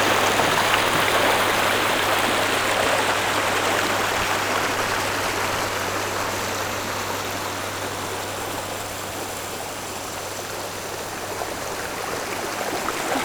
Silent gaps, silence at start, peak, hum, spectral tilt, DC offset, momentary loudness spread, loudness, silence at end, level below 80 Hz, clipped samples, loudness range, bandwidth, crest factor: none; 0 s; -4 dBFS; none; -2.5 dB/octave; under 0.1%; 11 LU; -23 LUFS; 0 s; -50 dBFS; under 0.1%; 9 LU; over 20 kHz; 20 dB